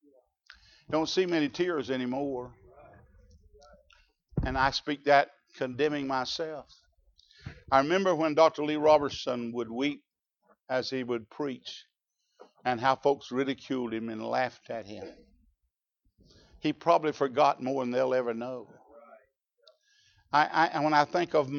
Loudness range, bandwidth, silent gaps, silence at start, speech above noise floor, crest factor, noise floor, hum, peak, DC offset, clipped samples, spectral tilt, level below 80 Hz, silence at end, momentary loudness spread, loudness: 7 LU; 7.2 kHz; none; 0.9 s; 53 dB; 22 dB; -82 dBFS; none; -8 dBFS; under 0.1%; under 0.1%; -5 dB/octave; -54 dBFS; 0 s; 15 LU; -29 LUFS